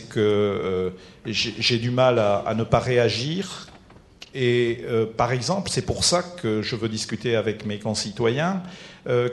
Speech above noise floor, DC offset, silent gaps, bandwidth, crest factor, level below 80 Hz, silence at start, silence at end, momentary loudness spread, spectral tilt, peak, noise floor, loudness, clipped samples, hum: 26 dB; under 0.1%; none; 12 kHz; 22 dB; -50 dBFS; 0 s; 0 s; 9 LU; -4.5 dB/octave; -2 dBFS; -49 dBFS; -23 LUFS; under 0.1%; none